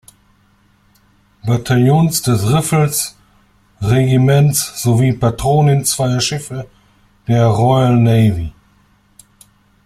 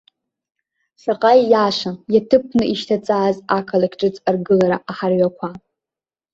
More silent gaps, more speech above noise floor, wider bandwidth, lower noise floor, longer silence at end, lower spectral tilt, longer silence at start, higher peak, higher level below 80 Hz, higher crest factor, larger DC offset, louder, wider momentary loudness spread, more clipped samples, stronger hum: neither; second, 41 dB vs 73 dB; first, 14.5 kHz vs 7.8 kHz; second, -54 dBFS vs -90 dBFS; first, 1.35 s vs 0.75 s; about the same, -5.5 dB/octave vs -6.5 dB/octave; first, 1.45 s vs 1.05 s; about the same, -2 dBFS vs -2 dBFS; first, -40 dBFS vs -56 dBFS; about the same, 14 dB vs 16 dB; neither; first, -14 LUFS vs -17 LUFS; first, 13 LU vs 8 LU; neither; neither